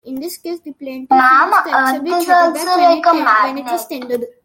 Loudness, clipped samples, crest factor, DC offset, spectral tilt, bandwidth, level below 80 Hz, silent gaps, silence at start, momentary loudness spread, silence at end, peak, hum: -13 LUFS; under 0.1%; 14 dB; under 0.1%; -2 dB/octave; 17 kHz; -66 dBFS; none; 0.05 s; 17 LU; 0.15 s; -2 dBFS; none